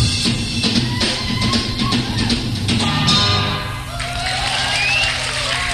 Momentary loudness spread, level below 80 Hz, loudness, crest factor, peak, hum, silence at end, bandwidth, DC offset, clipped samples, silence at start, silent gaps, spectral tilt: 7 LU; -32 dBFS; -17 LUFS; 14 dB; -4 dBFS; none; 0 s; 14 kHz; under 0.1%; under 0.1%; 0 s; none; -3.5 dB/octave